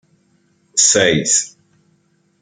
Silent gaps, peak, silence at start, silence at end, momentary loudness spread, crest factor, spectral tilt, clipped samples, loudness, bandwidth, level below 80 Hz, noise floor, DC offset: none; 0 dBFS; 0.75 s; 0.95 s; 10 LU; 18 dB; -1.5 dB/octave; under 0.1%; -13 LUFS; 11 kHz; -56 dBFS; -60 dBFS; under 0.1%